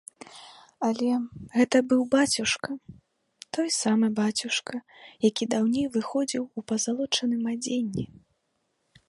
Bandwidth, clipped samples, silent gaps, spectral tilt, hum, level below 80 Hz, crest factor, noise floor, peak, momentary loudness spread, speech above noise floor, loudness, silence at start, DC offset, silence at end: 11.5 kHz; under 0.1%; none; -3.5 dB/octave; none; -64 dBFS; 18 dB; -75 dBFS; -8 dBFS; 15 LU; 49 dB; -26 LUFS; 0.3 s; under 0.1%; 1.05 s